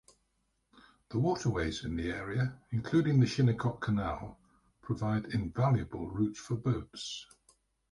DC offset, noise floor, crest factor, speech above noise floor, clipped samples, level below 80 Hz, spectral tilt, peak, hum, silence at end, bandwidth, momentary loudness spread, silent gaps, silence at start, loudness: under 0.1%; -78 dBFS; 18 dB; 46 dB; under 0.1%; -52 dBFS; -7 dB/octave; -16 dBFS; none; 0.7 s; 11 kHz; 12 LU; none; 0.75 s; -33 LUFS